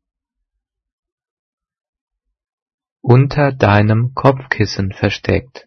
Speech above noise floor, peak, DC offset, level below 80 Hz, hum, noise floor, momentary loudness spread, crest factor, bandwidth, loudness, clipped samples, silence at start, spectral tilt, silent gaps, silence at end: 64 dB; 0 dBFS; under 0.1%; -44 dBFS; none; -78 dBFS; 7 LU; 18 dB; 6.6 kHz; -14 LUFS; under 0.1%; 3.05 s; -7.5 dB/octave; none; 0.1 s